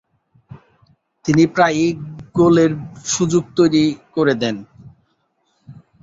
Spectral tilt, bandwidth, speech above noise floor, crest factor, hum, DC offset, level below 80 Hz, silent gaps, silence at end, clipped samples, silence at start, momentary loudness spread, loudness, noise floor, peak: -5.5 dB/octave; 7.8 kHz; 50 dB; 16 dB; none; under 0.1%; -52 dBFS; none; 0.3 s; under 0.1%; 0.5 s; 12 LU; -17 LUFS; -66 dBFS; -2 dBFS